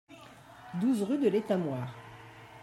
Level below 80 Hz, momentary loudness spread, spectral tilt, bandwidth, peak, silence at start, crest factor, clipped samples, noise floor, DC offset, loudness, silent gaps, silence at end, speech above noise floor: -72 dBFS; 23 LU; -7.5 dB/octave; 13 kHz; -16 dBFS; 0.1 s; 18 dB; under 0.1%; -52 dBFS; under 0.1%; -31 LUFS; none; 0 s; 23 dB